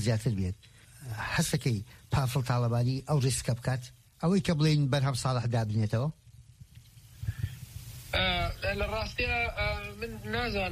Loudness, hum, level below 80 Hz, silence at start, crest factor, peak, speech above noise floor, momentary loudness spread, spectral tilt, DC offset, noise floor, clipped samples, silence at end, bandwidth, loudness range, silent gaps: -30 LUFS; none; -46 dBFS; 0 s; 18 dB; -12 dBFS; 24 dB; 12 LU; -5.5 dB/octave; under 0.1%; -53 dBFS; under 0.1%; 0 s; 15 kHz; 5 LU; none